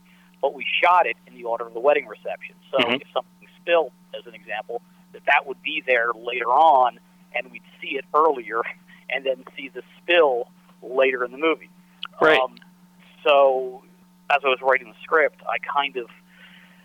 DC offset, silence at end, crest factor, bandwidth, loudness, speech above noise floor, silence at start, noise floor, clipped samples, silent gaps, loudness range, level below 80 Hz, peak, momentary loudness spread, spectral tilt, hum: under 0.1%; 0.8 s; 18 dB; 12.5 kHz; -22 LUFS; 30 dB; 0.45 s; -52 dBFS; under 0.1%; none; 3 LU; -72 dBFS; -6 dBFS; 18 LU; -4.5 dB/octave; none